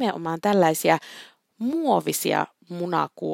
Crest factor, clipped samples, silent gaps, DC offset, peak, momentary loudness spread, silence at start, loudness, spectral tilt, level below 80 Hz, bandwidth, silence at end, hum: 20 dB; under 0.1%; none; under 0.1%; -4 dBFS; 13 LU; 0 s; -24 LUFS; -4.5 dB/octave; -74 dBFS; 16.5 kHz; 0 s; none